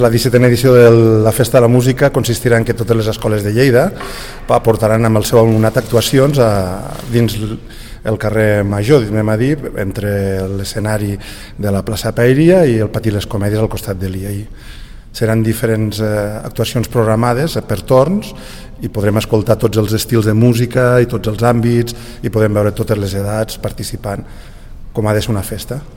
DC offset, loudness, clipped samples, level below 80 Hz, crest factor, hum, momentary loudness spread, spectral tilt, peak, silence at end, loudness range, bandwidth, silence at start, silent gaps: 0.4%; -13 LUFS; under 0.1%; -32 dBFS; 14 dB; none; 13 LU; -6.5 dB/octave; 0 dBFS; 0 s; 6 LU; 17.5 kHz; 0 s; none